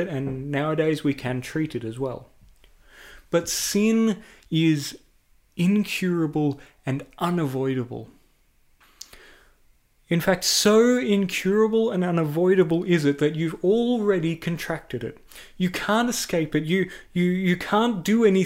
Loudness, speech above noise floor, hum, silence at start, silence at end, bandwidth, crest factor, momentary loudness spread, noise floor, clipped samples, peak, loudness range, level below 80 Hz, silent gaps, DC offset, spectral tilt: -23 LUFS; 38 dB; none; 0 s; 0 s; 16 kHz; 16 dB; 11 LU; -61 dBFS; under 0.1%; -8 dBFS; 7 LU; -54 dBFS; none; under 0.1%; -5 dB/octave